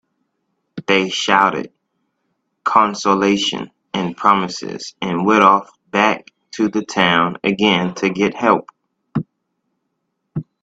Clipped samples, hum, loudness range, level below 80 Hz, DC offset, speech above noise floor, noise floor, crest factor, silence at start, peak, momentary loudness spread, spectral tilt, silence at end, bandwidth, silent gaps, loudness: under 0.1%; none; 2 LU; -58 dBFS; under 0.1%; 57 dB; -73 dBFS; 18 dB; 0.75 s; 0 dBFS; 15 LU; -4.5 dB/octave; 0.2 s; 8 kHz; none; -17 LUFS